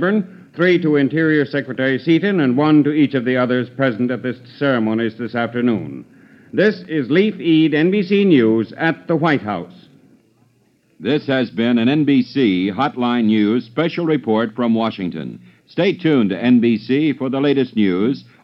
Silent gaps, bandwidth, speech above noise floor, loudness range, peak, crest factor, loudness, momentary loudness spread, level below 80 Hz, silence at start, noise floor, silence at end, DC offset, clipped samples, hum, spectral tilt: none; 6 kHz; 41 dB; 4 LU; -2 dBFS; 14 dB; -17 LUFS; 9 LU; -68 dBFS; 0 s; -58 dBFS; 0.2 s; under 0.1%; under 0.1%; none; -8.5 dB/octave